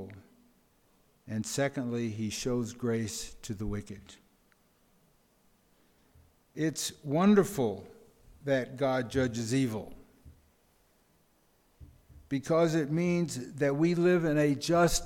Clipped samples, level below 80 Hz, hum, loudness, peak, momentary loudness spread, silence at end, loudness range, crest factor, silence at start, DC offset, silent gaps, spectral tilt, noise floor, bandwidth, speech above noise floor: under 0.1%; -54 dBFS; none; -30 LUFS; -12 dBFS; 14 LU; 0 s; 11 LU; 20 dB; 0 s; under 0.1%; none; -5.5 dB/octave; -68 dBFS; 17.5 kHz; 39 dB